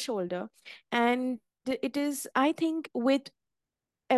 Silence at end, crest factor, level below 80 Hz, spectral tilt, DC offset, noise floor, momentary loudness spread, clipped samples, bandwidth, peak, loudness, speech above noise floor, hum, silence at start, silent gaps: 0 s; 20 dB; -78 dBFS; -4 dB/octave; under 0.1%; -89 dBFS; 11 LU; under 0.1%; 12.5 kHz; -12 dBFS; -30 LUFS; 59 dB; none; 0 s; none